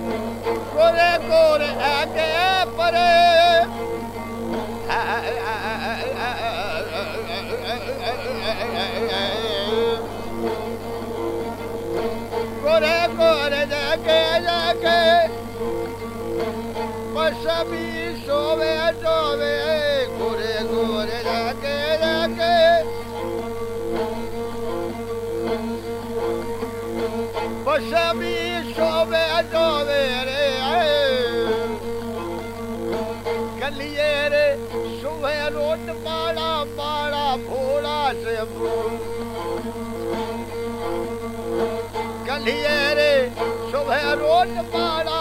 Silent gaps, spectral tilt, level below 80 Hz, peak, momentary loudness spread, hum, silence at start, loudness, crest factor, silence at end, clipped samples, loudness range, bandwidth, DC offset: none; -4.5 dB/octave; -44 dBFS; -6 dBFS; 11 LU; 50 Hz at -40 dBFS; 0 s; -22 LUFS; 16 dB; 0 s; under 0.1%; 7 LU; 16 kHz; under 0.1%